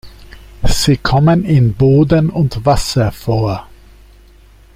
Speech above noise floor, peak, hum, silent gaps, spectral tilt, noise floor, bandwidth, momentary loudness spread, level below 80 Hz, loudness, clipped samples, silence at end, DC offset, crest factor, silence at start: 31 dB; 0 dBFS; none; none; -6.5 dB/octave; -43 dBFS; 16 kHz; 8 LU; -26 dBFS; -13 LUFS; under 0.1%; 1.1 s; under 0.1%; 12 dB; 0.05 s